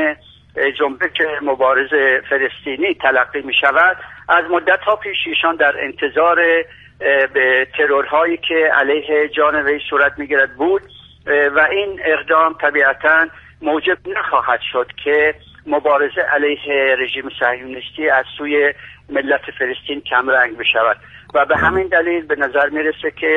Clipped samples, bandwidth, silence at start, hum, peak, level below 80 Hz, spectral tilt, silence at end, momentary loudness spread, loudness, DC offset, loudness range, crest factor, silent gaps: under 0.1%; 4.2 kHz; 0 s; none; 0 dBFS; -50 dBFS; -5.5 dB/octave; 0 s; 7 LU; -15 LUFS; under 0.1%; 2 LU; 16 dB; none